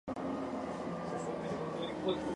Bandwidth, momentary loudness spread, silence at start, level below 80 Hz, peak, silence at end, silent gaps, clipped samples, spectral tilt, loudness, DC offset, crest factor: 11.5 kHz; 3 LU; 0.05 s; -62 dBFS; -22 dBFS; 0 s; none; under 0.1%; -6 dB/octave; -39 LUFS; under 0.1%; 16 dB